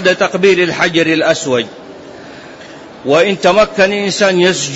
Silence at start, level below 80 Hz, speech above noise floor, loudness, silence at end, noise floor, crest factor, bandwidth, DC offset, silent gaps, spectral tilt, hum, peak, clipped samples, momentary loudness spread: 0 s; -48 dBFS; 21 dB; -12 LUFS; 0 s; -33 dBFS; 12 dB; 8 kHz; under 0.1%; none; -4 dB/octave; none; 0 dBFS; under 0.1%; 22 LU